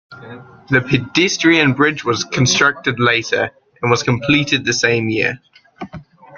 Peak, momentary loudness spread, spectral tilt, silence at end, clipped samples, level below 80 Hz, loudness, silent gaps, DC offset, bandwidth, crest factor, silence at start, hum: 0 dBFS; 21 LU; -4 dB/octave; 0 s; under 0.1%; -50 dBFS; -15 LUFS; none; under 0.1%; 7.4 kHz; 16 dB; 0.1 s; none